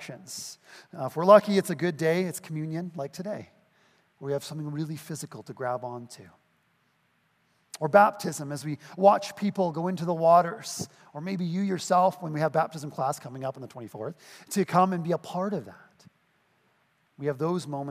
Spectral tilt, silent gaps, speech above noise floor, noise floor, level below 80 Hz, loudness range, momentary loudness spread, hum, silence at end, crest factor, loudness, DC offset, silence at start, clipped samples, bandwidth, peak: -6 dB/octave; none; 43 dB; -70 dBFS; -78 dBFS; 11 LU; 18 LU; none; 0 s; 24 dB; -27 LUFS; under 0.1%; 0 s; under 0.1%; 15.5 kHz; -4 dBFS